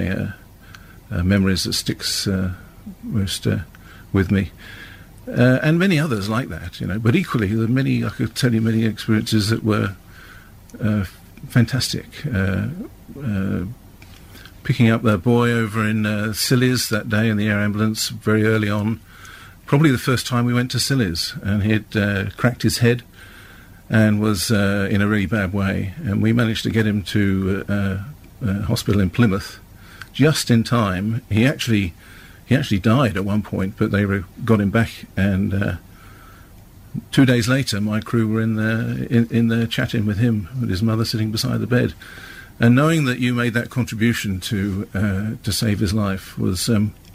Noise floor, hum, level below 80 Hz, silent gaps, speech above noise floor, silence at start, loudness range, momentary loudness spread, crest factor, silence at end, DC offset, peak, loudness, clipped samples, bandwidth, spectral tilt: -44 dBFS; none; -44 dBFS; none; 25 dB; 0 s; 3 LU; 10 LU; 16 dB; 0.05 s; under 0.1%; -4 dBFS; -20 LUFS; under 0.1%; 16 kHz; -5.5 dB/octave